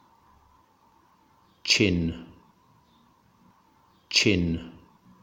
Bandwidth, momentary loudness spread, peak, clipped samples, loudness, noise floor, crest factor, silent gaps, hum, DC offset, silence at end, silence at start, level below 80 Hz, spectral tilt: 17 kHz; 17 LU; -8 dBFS; under 0.1%; -24 LUFS; -62 dBFS; 24 dB; none; none; under 0.1%; 0.5 s; 1.65 s; -50 dBFS; -3.5 dB/octave